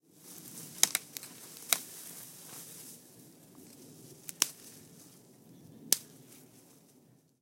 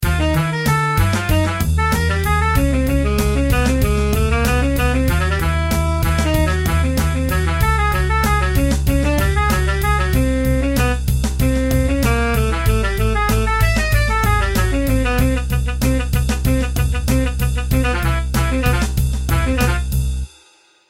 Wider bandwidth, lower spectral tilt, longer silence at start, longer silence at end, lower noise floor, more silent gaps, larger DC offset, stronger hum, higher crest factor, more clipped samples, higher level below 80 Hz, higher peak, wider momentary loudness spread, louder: about the same, 17 kHz vs 16.5 kHz; second, 0.5 dB/octave vs -5.5 dB/octave; first, 0.15 s vs 0 s; second, 0.25 s vs 0.65 s; first, -64 dBFS vs -52 dBFS; neither; neither; neither; first, 36 dB vs 14 dB; neither; second, -88 dBFS vs -20 dBFS; about the same, -4 dBFS vs -2 dBFS; first, 26 LU vs 3 LU; second, -34 LUFS vs -17 LUFS